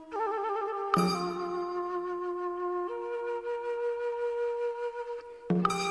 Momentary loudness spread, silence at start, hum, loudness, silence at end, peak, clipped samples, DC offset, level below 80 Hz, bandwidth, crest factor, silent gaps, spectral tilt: 7 LU; 0 s; none; -32 LUFS; 0 s; -12 dBFS; under 0.1%; under 0.1%; -68 dBFS; 11 kHz; 20 dB; none; -6 dB/octave